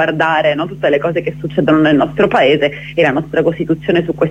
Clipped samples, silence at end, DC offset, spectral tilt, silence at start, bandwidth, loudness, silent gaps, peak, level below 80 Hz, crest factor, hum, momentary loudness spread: under 0.1%; 0 s; under 0.1%; -7.5 dB/octave; 0 s; 8.6 kHz; -14 LUFS; none; 0 dBFS; -44 dBFS; 12 dB; 50 Hz at -30 dBFS; 6 LU